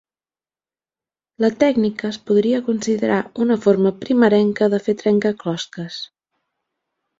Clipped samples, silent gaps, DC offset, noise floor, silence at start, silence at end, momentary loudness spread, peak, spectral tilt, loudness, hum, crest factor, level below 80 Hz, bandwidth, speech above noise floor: under 0.1%; none; under 0.1%; under -90 dBFS; 1.4 s; 1.15 s; 12 LU; -2 dBFS; -6 dB/octave; -18 LUFS; none; 18 dB; -62 dBFS; 7.8 kHz; over 72 dB